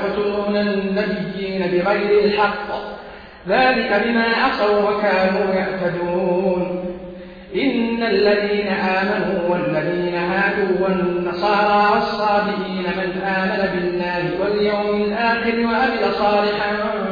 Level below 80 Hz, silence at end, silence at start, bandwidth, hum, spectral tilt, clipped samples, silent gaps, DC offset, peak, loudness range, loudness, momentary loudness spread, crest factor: -48 dBFS; 0 s; 0 s; 5.2 kHz; none; -7.5 dB/octave; under 0.1%; none; under 0.1%; -4 dBFS; 2 LU; -19 LUFS; 7 LU; 14 dB